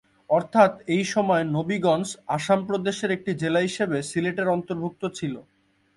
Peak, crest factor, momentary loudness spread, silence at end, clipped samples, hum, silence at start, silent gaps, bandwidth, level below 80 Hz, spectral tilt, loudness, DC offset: -4 dBFS; 20 dB; 10 LU; 0.55 s; under 0.1%; none; 0.3 s; none; 11.5 kHz; -64 dBFS; -5.5 dB/octave; -24 LUFS; under 0.1%